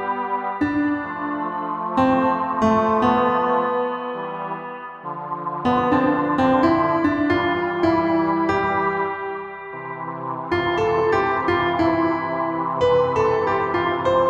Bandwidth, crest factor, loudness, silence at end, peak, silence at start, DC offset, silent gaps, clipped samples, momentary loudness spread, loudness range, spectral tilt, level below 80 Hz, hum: 8 kHz; 14 dB; -21 LUFS; 0 s; -6 dBFS; 0 s; under 0.1%; none; under 0.1%; 11 LU; 3 LU; -7 dB/octave; -52 dBFS; none